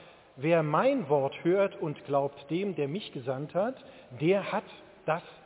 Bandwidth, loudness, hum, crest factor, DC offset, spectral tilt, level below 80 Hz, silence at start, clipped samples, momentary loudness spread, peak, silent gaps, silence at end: 4 kHz; -30 LUFS; none; 16 dB; under 0.1%; -10.5 dB/octave; -74 dBFS; 0 s; under 0.1%; 10 LU; -12 dBFS; none; 0.1 s